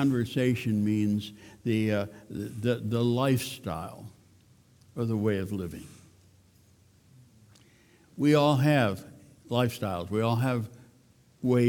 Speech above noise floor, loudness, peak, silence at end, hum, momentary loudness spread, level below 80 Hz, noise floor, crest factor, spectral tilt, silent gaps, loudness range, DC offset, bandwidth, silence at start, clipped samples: 34 dB; -28 LUFS; -10 dBFS; 0 s; none; 17 LU; -62 dBFS; -61 dBFS; 18 dB; -7 dB/octave; none; 8 LU; under 0.1%; 19 kHz; 0 s; under 0.1%